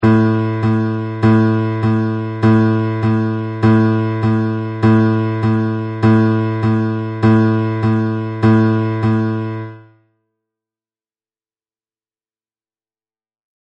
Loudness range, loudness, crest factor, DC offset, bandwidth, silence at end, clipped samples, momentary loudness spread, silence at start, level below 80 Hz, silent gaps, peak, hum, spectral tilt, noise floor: 5 LU; -15 LUFS; 14 dB; under 0.1%; 5.6 kHz; 3.85 s; under 0.1%; 8 LU; 0 s; -46 dBFS; none; -2 dBFS; none; -9.5 dB/octave; under -90 dBFS